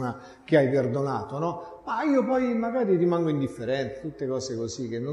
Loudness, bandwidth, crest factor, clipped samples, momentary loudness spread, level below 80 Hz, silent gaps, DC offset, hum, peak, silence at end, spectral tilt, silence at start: -26 LUFS; 11.5 kHz; 18 dB; under 0.1%; 10 LU; -60 dBFS; none; under 0.1%; none; -8 dBFS; 0 s; -7 dB/octave; 0 s